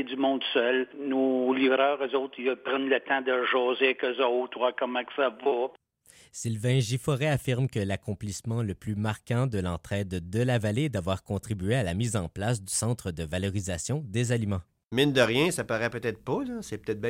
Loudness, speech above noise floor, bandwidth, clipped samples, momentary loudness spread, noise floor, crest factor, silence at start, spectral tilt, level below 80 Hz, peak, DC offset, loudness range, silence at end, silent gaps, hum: -28 LUFS; 31 dB; 16 kHz; under 0.1%; 8 LU; -58 dBFS; 18 dB; 0 s; -5 dB/octave; -54 dBFS; -10 dBFS; under 0.1%; 4 LU; 0 s; 14.84-14.88 s; none